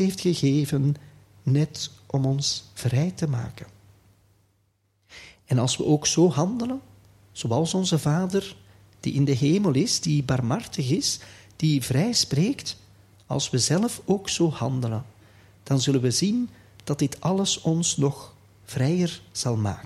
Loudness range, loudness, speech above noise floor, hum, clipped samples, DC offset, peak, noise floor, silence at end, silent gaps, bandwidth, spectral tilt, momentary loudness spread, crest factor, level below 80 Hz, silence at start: 4 LU; -24 LUFS; 45 dB; none; under 0.1%; under 0.1%; -8 dBFS; -68 dBFS; 0 s; none; 14.5 kHz; -5 dB/octave; 12 LU; 16 dB; -56 dBFS; 0 s